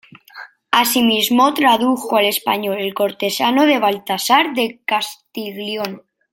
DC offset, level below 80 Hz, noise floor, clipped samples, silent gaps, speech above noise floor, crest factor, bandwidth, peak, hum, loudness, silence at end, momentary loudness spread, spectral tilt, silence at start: under 0.1%; -66 dBFS; -39 dBFS; under 0.1%; none; 23 dB; 16 dB; 17 kHz; -2 dBFS; none; -16 LUFS; 0.35 s; 12 LU; -2.5 dB/octave; 0.35 s